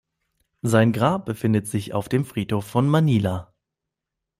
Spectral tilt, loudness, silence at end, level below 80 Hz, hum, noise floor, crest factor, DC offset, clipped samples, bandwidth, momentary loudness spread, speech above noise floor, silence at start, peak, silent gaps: -7 dB/octave; -22 LUFS; 0.95 s; -56 dBFS; none; -84 dBFS; 18 dB; under 0.1%; under 0.1%; 16 kHz; 8 LU; 63 dB; 0.65 s; -4 dBFS; none